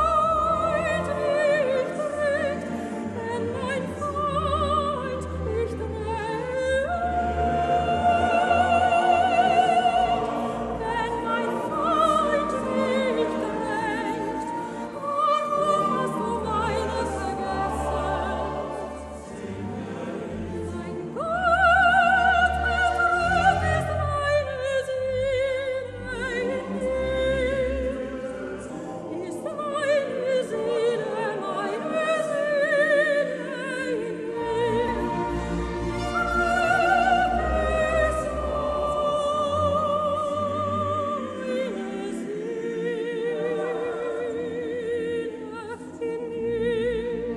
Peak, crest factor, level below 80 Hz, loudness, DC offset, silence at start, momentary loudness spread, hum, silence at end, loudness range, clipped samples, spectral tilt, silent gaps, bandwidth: -8 dBFS; 18 dB; -42 dBFS; -25 LUFS; under 0.1%; 0 s; 11 LU; none; 0 s; 8 LU; under 0.1%; -5.5 dB/octave; none; 12 kHz